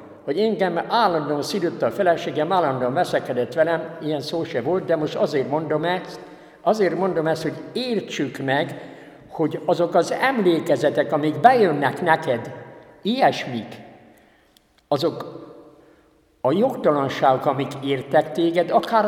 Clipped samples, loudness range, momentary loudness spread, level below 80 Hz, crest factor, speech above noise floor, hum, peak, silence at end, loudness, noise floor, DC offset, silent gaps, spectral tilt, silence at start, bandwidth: under 0.1%; 6 LU; 9 LU; -66 dBFS; 22 dB; 38 dB; none; 0 dBFS; 0 s; -21 LUFS; -58 dBFS; under 0.1%; none; -6 dB/octave; 0 s; 16.5 kHz